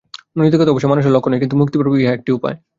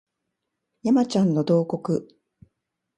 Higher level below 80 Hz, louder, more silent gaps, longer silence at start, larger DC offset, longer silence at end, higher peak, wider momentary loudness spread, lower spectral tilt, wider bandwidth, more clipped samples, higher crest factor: first, -54 dBFS vs -68 dBFS; first, -15 LUFS vs -23 LUFS; neither; second, 0.35 s vs 0.85 s; neither; second, 0.25 s vs 0.95 s; first, -2 dBFS vs -8 dBFS; about the same, 6 LU vs 8 LU; about the same, -8.5 dB/octave vs -7.5 dB/octave; second, 7.6 kHz vs 10.5 kHz; neither; about the same, 14 dB vs 16 dB